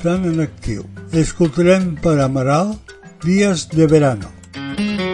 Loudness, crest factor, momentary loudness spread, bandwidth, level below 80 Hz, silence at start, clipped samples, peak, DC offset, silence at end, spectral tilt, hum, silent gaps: -17 LUFS; 16 dB; 14 LU; 11 kHz; -38 dBFS; 0 s; under 0.1%; 0 dBFS; under 0.1%; 0 s; -6.5 dB/octave; none; none